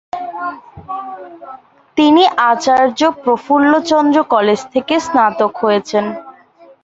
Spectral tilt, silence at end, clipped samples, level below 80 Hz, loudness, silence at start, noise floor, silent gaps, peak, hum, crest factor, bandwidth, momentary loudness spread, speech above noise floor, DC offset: -4.5 dB/octave; 0.5 s; under 0.1%; -56 dBFS; -13 LUFS; 0.15 s; -44 dBFS; none; -2 dBFS; none; 14 dB; 8 kHz; 16 LU; 31 dB; under 0.1%